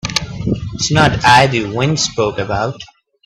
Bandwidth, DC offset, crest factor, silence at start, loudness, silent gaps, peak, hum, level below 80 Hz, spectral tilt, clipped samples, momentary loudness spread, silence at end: 13.5 kHz; under 0.1%; 16 dB; 0.05 s; -14 LUFS; none; 0 dBFS; none; -36 dBFS; -4 dB/octave; under 0.1%; 11 LU; 0.4 s